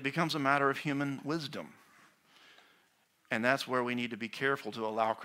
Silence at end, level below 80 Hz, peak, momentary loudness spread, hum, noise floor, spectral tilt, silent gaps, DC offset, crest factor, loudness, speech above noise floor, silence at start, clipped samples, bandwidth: 0 s; -78 dBFS; -10 dBFS; 9 LU; none; -71 dBFS; -5 dB/octave; none; under 0.1%; 24 dB; -33 LUFS; 38 dB; 0 s; under 0.1%; 16 kHz